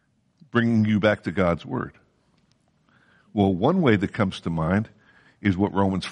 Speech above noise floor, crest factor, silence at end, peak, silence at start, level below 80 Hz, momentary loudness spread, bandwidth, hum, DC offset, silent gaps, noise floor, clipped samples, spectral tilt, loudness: 42 dB; 18 dB; 0 s; -6 dBFS; 0.55 s; -52 dBFS; 10 LU; 10 kHz; none; under 0.1%; none; -64 dBFS; under 0.1%; -7.5 dB/octave; -23 LUFS